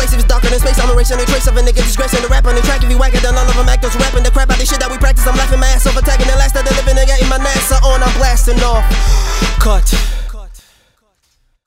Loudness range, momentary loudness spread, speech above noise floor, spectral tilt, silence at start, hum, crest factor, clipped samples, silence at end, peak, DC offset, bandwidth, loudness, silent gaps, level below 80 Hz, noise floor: 2 LU; 2 LU; 49 dB; -4 dB/octave; 0 s; none; 10 dB; under 0.1%; 1.1 s; 0 dBFS; under 0.1%; 16 kHz; -13 LUFS; none; -10 dBFS; -58 dBFS